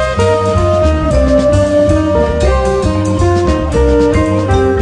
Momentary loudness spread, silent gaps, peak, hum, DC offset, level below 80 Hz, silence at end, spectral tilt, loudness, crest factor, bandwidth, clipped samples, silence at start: 3 LU; none; 0 dBFS; none; under 0.1%; -18 dBFS; 0 s; -7 dB/octave; -11 LUFS; 10 dB; 10 kHz; under 0.1%; 0 s